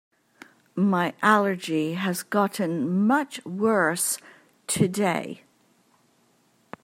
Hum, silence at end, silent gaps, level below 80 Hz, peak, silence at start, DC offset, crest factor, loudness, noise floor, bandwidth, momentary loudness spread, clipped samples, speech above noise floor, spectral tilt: none; 1.5 s; none; -70 dBFS; -4 dBFS; 0.75 s; under 0.1%; 22 dB; -24 LUFS; -64 dBFS; 16 kHz; 11 LU; under 0.1%; 40 dB; -4.5 dB/octave